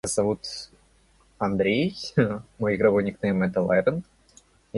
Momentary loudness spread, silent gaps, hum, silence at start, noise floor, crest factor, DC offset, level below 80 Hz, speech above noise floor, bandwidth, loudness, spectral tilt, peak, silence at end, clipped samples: 11 LU; none; none; 0.05 s; -60 dBFS; 18 dB; under 0.1%; -54 dBFS; 36 dB; 11.5 kHz; -25 LUFS; -5.5 dB/octave; -8 dBFS; 0 s; under 0.1%